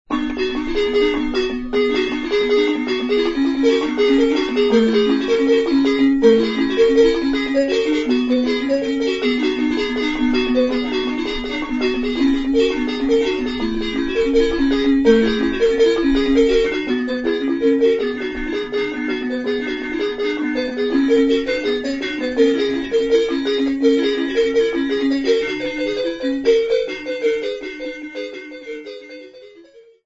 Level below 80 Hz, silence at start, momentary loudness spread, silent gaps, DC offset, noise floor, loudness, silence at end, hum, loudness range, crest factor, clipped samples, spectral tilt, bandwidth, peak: -38 dBFS; 0.1 s; 8 LU; none; under 0.1%; -46 dBFS; -18 LUFS; 0.25 s; none; 5 LU; 16 dB; under 0.1%; -4.5 dB/octave; 7.8 kHz; -2 dBFS